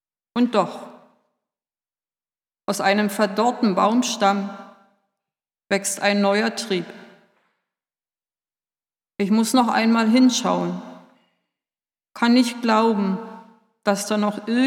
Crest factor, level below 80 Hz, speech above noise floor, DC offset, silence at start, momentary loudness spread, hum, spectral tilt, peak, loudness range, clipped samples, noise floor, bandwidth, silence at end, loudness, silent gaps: 20 dB; -80 dBFS; over 70 dB; under 0.1%; 0.35 s; 12 LU; none; -4.5 dB/octave; -4 dBFS; 4 LU; under 0.1%; under -90 dBFS; 16.5 kHz; 0 s; -20 LUFS; none